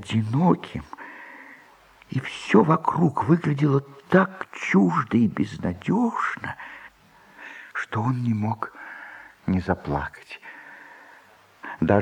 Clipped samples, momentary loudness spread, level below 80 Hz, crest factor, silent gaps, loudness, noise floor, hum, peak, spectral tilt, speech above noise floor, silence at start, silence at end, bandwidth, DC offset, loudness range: under 0.1%; 21 LU; -52 dBFS; 20 dB; none; -24 LUFS; -54 dBFS; none; -4 dBFS; -8 dB/octave; 31 dB; 0 s; 0 s; 10 kHz; under 0.1%; 9 LU